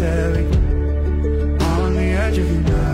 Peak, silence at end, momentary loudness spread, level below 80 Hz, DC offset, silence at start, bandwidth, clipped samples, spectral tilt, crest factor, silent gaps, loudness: -8 dBFS; 0 s; 2 LU; -20 dBFS; under 0.1%; 0 s; 11.5 kHz; under 0.1%; -7.5 dB/octave; 10 dB; none; -19 LUFS